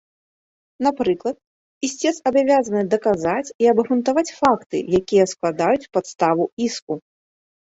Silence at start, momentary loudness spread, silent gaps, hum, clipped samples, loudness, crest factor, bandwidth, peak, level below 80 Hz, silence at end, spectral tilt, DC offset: 0.8 s; 10 LU; 1.47-1.81 s, 3.55-3.59 s, 4.66-4.70 s, 6.52-6.57 s, 6.82-6.87 s; none; under 0.1%; -20 LUFS; 16 dB; 8.2 kHz; -4 dBFS; -56 dBFS; 0.75 s; -5 dB/octave; under 0.1%